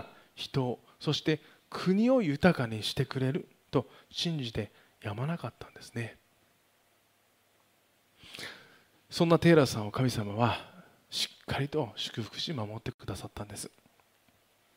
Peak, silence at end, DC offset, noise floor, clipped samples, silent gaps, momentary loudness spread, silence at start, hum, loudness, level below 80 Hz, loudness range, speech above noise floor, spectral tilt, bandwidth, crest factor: -10 dBFS; 1.1 s; under 0.1%; -69 dBFS; under 0.1%; 12.94-12.99 s; 18 LU; 0 s; none; -31 LUFS; -60 dBFS; 13 LU; 39 dB; -6 dB/octave; 16 kHz; 24 dB